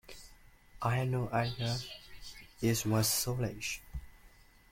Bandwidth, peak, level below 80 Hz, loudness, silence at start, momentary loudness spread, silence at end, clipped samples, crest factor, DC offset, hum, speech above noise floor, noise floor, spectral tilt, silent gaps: 16.5 kHz; -18 dBFS; -54 dBFS; -33 LUFS; 0.05 s; 20 LU; 0.45 s; under 0.1%; 18 dB; under 0.1%; none; 27 dB; -60 dBFS; -4.5 dB/octave; none